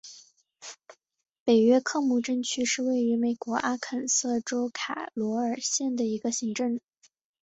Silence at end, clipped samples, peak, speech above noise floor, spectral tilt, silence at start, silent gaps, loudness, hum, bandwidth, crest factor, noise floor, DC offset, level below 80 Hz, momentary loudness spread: 0.75 s; under 0.1%; -12 dBFS; 30 dB; -3 dB/octave; 0.05 s; 1.40-1.46 s; -27 LUFS; none; 8.4 kHz; 16 dB; -57 dBFS; under 0.1%; -74 dBFS; 10 LU